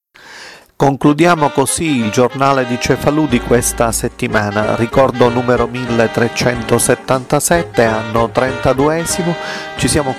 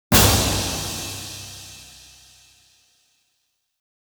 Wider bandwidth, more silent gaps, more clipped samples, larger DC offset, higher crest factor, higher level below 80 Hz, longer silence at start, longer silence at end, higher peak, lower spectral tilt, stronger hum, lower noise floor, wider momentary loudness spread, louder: second, 16 kHz vs over 20 kHz; neither; neither; first, 0.2% vs under 0.1%; second, 14 dB vs 22 dB; about the same, -34 dBFS vs -36 dBFS; first, 0.25 s vs 0.1 s; second, 0 s vs 2.15 s; about the same, 0 dBFS vs -2 dBFS; first, -4.5 dB/octave vs -3 dB/octave; neither; second, -36 dBFS vs -72 dBFS; second, 5 LU vs 25 LU; first, -14 LUFS vs -20 LUFS